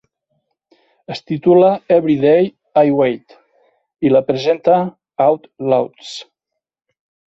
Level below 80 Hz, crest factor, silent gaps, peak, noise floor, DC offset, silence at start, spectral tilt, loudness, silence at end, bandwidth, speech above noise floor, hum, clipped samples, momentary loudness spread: -60 dBFS; 14 dB; none; -2 dBFS; -80 dBFS; under 0.1%; 1.1 s; -7.5 dB/octave; -15 LUFS; 1.05 s; 7.8 kHz; 66 dB; none; under 0.1%; 17 LU